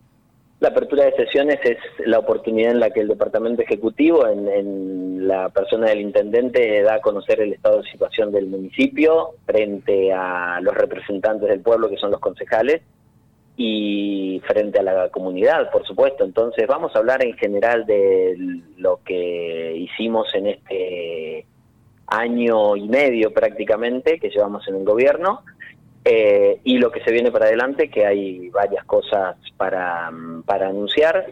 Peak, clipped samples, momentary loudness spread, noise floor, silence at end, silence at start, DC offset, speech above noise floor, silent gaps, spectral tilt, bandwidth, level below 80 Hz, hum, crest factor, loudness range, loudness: -6 dBFS; under 0.1%; 8 LU; -57 dBFS; 0 s; 0.6 s; under 0.1%; 38 dB; none; -6.5 dB/octave; 6.8 kHz; -58 dBFS; none; 12 dB; 4 LU; -19 LUFS